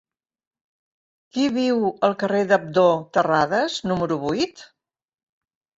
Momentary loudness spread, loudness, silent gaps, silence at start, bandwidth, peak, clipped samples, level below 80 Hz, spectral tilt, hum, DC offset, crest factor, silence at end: 6 LU; -21 LUFS; none; 1.35 s; 8 kHz; -4 dBFS; under 0.1%; -60 dBFS; -5.5 dB/octave; none; under 0.1%; 18 dB; 1.15 s